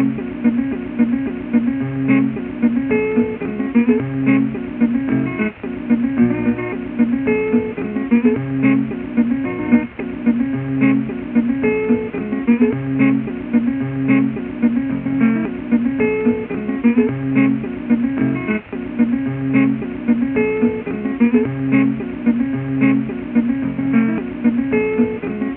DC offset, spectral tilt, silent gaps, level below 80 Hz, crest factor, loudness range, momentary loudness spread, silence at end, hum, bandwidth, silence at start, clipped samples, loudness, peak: under 0.1%; -8 dB/octave; none; -46 dBFS; 16 dB; 1 LU; 5 LU; 0 s; none; 3.6 kHz; 0 s; under 0.1%; -18 LUFS; -2 dBFS